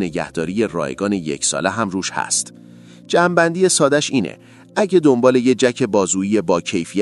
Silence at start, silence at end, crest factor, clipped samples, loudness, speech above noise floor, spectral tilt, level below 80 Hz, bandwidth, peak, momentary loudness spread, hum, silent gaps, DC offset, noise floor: 0 s; 0 s; 18 dB; under 0.1%; -17 LUFS; 24 dB; -4 dB/octave; -56 dBFS; 12 kHz; 0 dBFS; 8 LU; none; none; under 0.1%; -42 dBFS